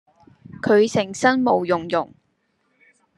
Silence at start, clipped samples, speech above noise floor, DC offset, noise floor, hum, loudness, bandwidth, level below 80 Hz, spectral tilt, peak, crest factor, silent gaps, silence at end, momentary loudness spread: 0.5 s; under 0.1%; 50 dB; under 0.1%; -69 dBFS; none; -20 LUFS; 11.5 kHz; -64 dBFS; -5 dB/octave; -2 dBFS; 20 dB; none; 1.1 s; 9 LU